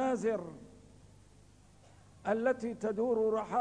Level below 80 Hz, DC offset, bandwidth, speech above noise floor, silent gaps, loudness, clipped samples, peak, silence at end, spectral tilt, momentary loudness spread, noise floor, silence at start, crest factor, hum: -66 dBFS; under 0.1%; 10 kHz; 28 dB; none; -33 LUFS; under 0.1%; -18 dBFS; 0 s; -6.5 dB/octave; 12 LU; -61 dBFS; 0 s; 16 dB; 50 Hz at -65 dBFS